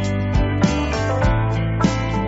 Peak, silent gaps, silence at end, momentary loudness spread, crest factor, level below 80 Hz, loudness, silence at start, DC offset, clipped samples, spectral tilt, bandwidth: -6 dBFS; none; 0 s; 2 LU; 12 dB; -26 dBFS; -20 LUFS; 0 s; under 0.1%; under 0.1%; -6.5 dB/octave; 8 kHz